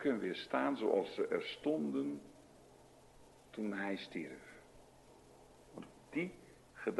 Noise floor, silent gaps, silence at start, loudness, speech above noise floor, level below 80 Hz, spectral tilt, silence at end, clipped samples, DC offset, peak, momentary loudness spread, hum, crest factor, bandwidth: -62 dBFS; none; 0 s; -39 LUFS; 24 dB; -74 dBFS; -6 dB/octave; 0 s; under 0.1%; under 0.1%; -18 dBFS; 22 LU; none; 22 dB; 12 kHz